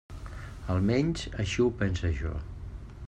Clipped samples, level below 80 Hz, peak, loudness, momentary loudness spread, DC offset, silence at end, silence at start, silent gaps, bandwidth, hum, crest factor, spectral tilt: under 0.1%; -42 dBFS; -14 dBFS; -29 LUFS; 16 LU; under 0.1%; 0 s; 0.1 s; none; 9.8 kHz; none; 16 dB; -6.5 dB/octave